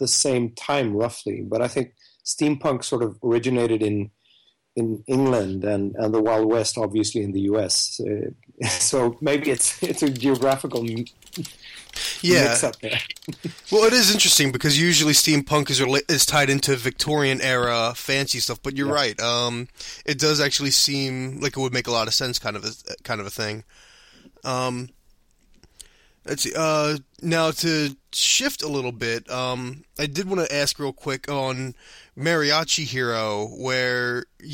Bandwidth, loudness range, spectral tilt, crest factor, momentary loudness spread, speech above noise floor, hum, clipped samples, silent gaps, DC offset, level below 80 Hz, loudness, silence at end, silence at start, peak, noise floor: 16.5 kHz; 9 LU; -3 dB/octave; 20 dB; 14 LU; 38 dB; none; under 0.1%; none; under 0.1%; -54 dBFS; -21 LUFS; 0 s; 0 s; -4 dBFS; -61 dBFS